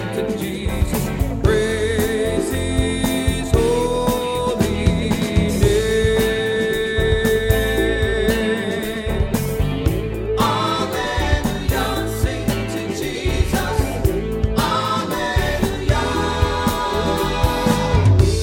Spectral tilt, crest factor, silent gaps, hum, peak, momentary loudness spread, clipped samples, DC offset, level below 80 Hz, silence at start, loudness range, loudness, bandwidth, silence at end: -5.5 dB/octave; 16 dB; none; none; -2 dBFS; 5 LU; under 0.1%; under 0.1%; -26 dBFS; 0 s; 3 LU; -19 LUFS; 17 kHz; 0 s